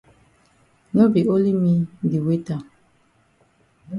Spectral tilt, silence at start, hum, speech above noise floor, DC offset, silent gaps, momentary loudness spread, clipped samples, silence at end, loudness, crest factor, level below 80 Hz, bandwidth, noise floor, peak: -10 dB/octave; 0.95 s; none; 42 dB; under 0.1%; none; 9 LU; under 0.1%; 0 s; -20 LUFS; 18 dB; -60 dBFS; 10.5 kHz; -61 dBFS; -4 dBFS